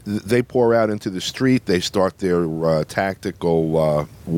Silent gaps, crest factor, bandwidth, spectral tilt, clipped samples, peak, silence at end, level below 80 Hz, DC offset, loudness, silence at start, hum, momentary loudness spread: none; 16 dB; 17 kHz; -6 dB/octave; under 0.1%; -4 dBFS; 0 s; -48 dBFS; under 0.1%; -20 LUFS; 0.05 s; none; 7 LU